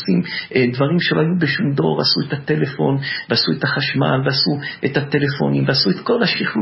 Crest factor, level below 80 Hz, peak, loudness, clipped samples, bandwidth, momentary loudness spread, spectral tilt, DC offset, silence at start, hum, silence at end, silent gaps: 16 dB; -56 dBFS; -2 dBFS; -18 LUFS; under 0.1%; 5.8 kHz; 4 LU; -9.5 dB/octave; under 0.1%; 0 s; none; 0 s; none